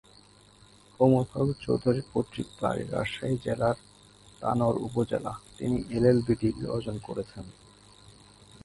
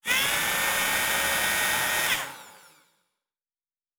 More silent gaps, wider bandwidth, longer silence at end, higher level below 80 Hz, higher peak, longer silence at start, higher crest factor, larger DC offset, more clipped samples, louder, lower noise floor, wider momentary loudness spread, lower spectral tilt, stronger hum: neither; second, 11.5 kHz vs over 20 kHz; second, 0.55 s vs 1.4 s; about the same, -52 dBFS vs -56 dBFS; about the same, -8 dBFS vs -8 dBFS; first, 1 s vs 0.05 s; about the same, 22 dB vs 20 dB; neither; neither; second, -29 LUFS vs -23 LUFS; second, -56 dBFS vs under -90 dBFS; first, 13 LU vs 5 LU; first, -7.5 dB/octave vs 0 dB/octave; neither